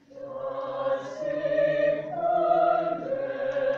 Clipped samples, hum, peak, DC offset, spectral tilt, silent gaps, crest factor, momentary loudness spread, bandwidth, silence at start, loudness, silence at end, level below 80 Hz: under 0.1%; none; -12 dBFS; under 0.1%; -6.5 dB/octave; none; 16 dB; 10 LU; 7 kHz; 0.1 s; -27 LUFS; 0 s; -66 dBFS